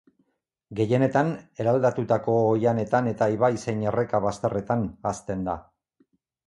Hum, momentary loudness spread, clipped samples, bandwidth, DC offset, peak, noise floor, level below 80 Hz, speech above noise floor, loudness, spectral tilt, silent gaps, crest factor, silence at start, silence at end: none; 8 LU; under 0.1%; 11.5 kHz; under 0.1%; -8 dBFS; -73 dBFS; -54 dBFS; 49 dB; -25 LUFS; -7.5 dB/octave; none; 18 dB; 0.7 s; 0.85 s